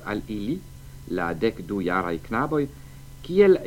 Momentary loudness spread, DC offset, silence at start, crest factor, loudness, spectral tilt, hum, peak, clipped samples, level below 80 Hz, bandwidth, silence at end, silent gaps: 21 LU; under 0.1%; 0 s; 20 dB; -26 LUFS; -7 dB/octave; none; -6 dBFS; under 0.1%; -46 dBFS; 17 kHz; 0 s; none